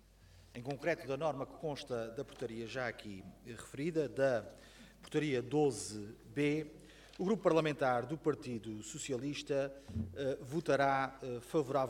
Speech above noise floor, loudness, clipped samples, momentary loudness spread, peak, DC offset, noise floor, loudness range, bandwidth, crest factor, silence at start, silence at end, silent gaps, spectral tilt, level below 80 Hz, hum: 24 dB; -37 LUFS; under 0.1%; 17 LU; -18 dBFS; under 0.1%; -61 dBFS; 5 LU; 16.5 kHz; 20 dB; 0.2 s; 0 s; none; -5.5 dB/octave; -64 dBFS; none